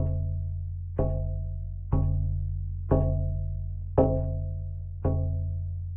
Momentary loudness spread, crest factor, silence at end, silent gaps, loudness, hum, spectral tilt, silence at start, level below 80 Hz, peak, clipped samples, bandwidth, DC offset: 9 LU; 20 dB; 0 s; none; -30 LUFS; none; -14 dB/octave; 0 s; -34 dBFS; -8 dBFS; under 0.1%; 1.9 kHz; under 0.1%